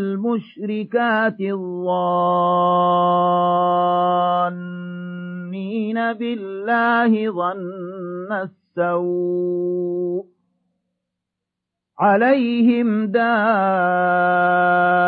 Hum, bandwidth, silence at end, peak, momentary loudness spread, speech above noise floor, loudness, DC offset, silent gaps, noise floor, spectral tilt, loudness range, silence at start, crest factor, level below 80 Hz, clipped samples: none; 4.8 kHz; 0 s; -4 dBFS; 13 LU; 64 dB; -19 LUFS; under 0.1%; none; -82 dBFS; -9.5 dB/octave; 6 LU; 0 s; 16 dB; -74 dBFS; under 0.1%